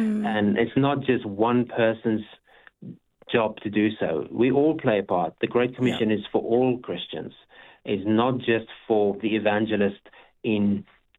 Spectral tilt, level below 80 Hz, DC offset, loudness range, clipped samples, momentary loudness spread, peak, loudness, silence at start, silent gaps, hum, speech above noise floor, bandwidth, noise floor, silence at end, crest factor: -8 dB/octave; -62 dBFS; under 0.1%; 2 LU; under 0.1%; 10 LU; -6 dBFS; -24 LUFS; 0 s; none; none; 25 dB; 7.6 kHz; -48 dBFS; 0.35 s; 18 dB